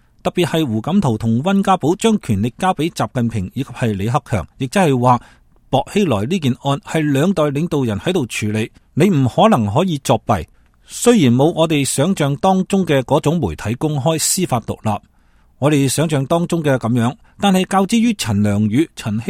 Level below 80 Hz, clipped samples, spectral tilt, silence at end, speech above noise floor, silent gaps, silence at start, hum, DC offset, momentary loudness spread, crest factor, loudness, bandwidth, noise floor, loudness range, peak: -44 dBFS; under 0.1%; -5.5 dB/octave; 0 s; 36 dB; none; 0.25 s; none; under 0.1%; 7 LU; 16 dB; -17 LUFS; 16 kHz; -52 dBFS; 3 LU; 0 dBFS